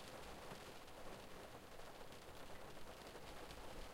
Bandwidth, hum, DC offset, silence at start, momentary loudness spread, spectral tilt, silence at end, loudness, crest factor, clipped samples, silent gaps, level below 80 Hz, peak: 16 kHz; none; under 0.1%; 0 s; 3 LU; -3.5 dB/octave; 0 s; -56 LUFS; 14 dB; under 0.1%; none; -62 dBFS; -40 dBFS